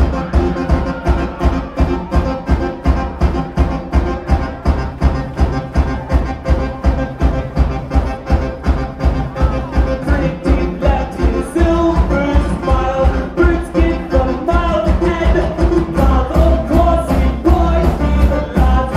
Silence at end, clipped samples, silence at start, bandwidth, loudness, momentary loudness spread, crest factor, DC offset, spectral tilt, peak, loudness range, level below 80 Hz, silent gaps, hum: 0 s; under 0.1%; 0 s; 10.5 kHz; -16 LUFS; 5 LU; 14 dB; under 0.1%; -8 dB/octave; 0 dBFS; 4 LU; -16 dBFS; none; none